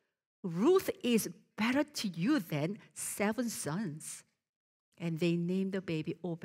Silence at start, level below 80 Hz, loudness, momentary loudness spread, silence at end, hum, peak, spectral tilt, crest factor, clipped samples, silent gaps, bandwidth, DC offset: 0.45 s; -76 dBFS; -34 LUFS; 11 LU; 0 s; none; -18 dBFS; -5 dB/octave; 16 dB; under 0.1%; 4.49-4.92 s; 16 kHz; under 0.1%